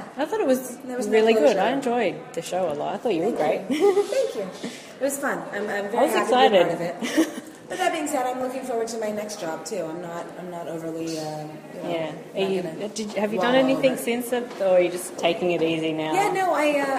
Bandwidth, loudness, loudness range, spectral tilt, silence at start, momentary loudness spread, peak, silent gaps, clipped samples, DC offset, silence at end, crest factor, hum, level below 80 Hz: 15.5 kHz; -24 LUFS; 8 LU; -4 dB/octave; 0 s; 13 LU; -4 dBFS; none; under 0.1%; under 0.1%; 0 s; 20 dB; none; -70 dBFS